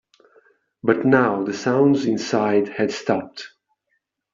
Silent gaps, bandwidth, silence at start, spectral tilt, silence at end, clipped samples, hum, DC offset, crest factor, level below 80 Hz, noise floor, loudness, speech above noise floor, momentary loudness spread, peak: none; 7.6 kHz; 0.85 s; -6 dB/octave; 0.85 s; under 0.1%; none; under 0.1%; 18 dB; -64 dBFS; -73 dBFS; -20 LUFS; 54 dB; 10 LU; -2 dBFS